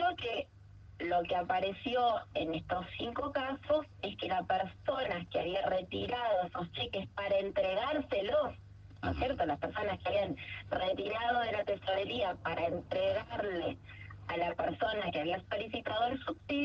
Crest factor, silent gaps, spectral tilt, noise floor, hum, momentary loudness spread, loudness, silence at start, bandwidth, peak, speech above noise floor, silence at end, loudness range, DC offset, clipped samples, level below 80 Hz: 16 dB; none; -7 dB/octave; -55 dBFS; none; 7 LU; -35 LUFS; 0 s; 6.8 kHz; -20 dBFS; 20 dB; 0 s; 1 LU; under 0.1%; under 0.1%; -58 dBFS